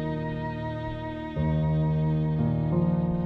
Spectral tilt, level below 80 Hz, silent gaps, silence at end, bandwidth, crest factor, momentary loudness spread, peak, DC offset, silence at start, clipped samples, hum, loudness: -10.5 dB/octave; -42 dBFS; none; 0 s; 4.6 kHz; 12 dB; 8 LU; -14 dBFS; under 0.1%; 0 s; under 0.1%; none; -27 LUFS